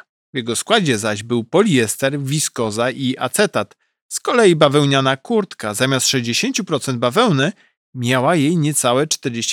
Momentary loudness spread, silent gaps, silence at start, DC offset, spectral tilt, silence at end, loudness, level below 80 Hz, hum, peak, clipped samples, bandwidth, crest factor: 8 LU; 4.02-4.09 s, 7.77-7.93 s; 0.35 s; under 0.1%; -4 dB/octave; 0 s; -17 LUFS; -64 dBFS; none; -2 dBFS; under 0.1%; 18.5 kHz; 16 dB